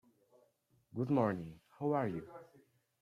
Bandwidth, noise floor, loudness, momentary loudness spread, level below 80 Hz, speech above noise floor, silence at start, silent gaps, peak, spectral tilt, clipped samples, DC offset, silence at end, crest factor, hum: 12.5 kHz; -74 dBFS; -37 LUFS; 19 LU; -74 dBFS; 38 dB; 0.95 s; none; -20 dBFS; -9.5 dB/octave; under 0.1%; under 0.1%; 0.6 s; 20 dB; none